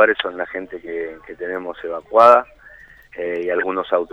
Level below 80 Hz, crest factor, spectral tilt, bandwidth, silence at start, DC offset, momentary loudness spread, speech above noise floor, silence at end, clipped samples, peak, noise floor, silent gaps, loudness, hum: -56 dBFS; 20 dB; -5 dB/octave; 8.4 kHz; 0 s; under 0.1%; 19 LU; 26 dB; 0.05 s; under 0.1%; 0 dBFS; -45 dBFS; none; -19 LUFS; none